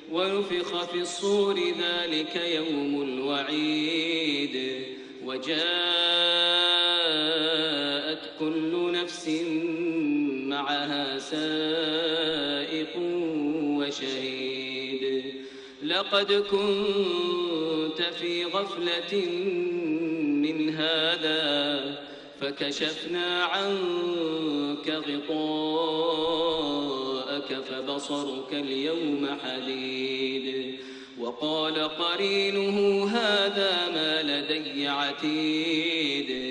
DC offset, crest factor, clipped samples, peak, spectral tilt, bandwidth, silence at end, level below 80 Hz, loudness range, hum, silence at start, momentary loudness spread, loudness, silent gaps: under 0.1%; 18 dB; under 0.1%; -10 dBFS; -4 dB/octave; 10 kHz; 0 s; -68 dBFS; 6 LU; none; 0 s; 8 LU; -27 LUFS; none